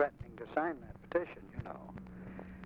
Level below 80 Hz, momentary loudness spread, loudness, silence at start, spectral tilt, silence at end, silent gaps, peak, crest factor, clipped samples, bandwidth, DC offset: -58 dBFS; 13 LU; -41 LUFS; 0 s; -9 dB/octave; 0 s; none; -18 dBFS; 22 dB; under 0.1%; 6.2 kHz; under 0.1%